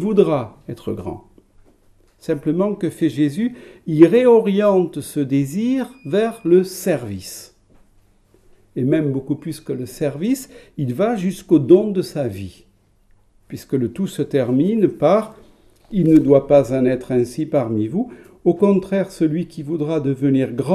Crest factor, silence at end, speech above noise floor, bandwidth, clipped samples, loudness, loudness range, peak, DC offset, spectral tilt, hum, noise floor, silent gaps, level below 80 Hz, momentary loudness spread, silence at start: 18 dB; 0 s; 37 dB; 15 kHz; under 0.1%; -18 LUFS; 7 LU; 0 dBFS; under 0.1%; -7.5 dB/octave; none; -55 dBFS; none; -52 dBFS; 16 LU; 0 s